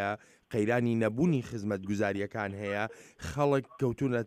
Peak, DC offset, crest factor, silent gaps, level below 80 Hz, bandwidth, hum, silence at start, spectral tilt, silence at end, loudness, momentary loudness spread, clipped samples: -16 dBFS; under 0.1%; 16 dB; none; -58 dBFS; 15 kHz; none; 0 s; -7 dB/octave; 0 s; -31 LUFS; 9 LU; under 0.1%